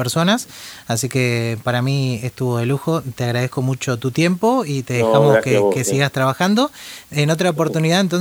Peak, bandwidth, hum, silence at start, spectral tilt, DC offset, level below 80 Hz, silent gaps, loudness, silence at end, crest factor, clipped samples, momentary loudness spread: -2 dBFS; over 20 kHz; none; 0 s; -5.5 dB/octave; under 0.1%; -56 dBFS; none; -18 LUFS; 0 s; 16 dB; under 0.1%; 8 LU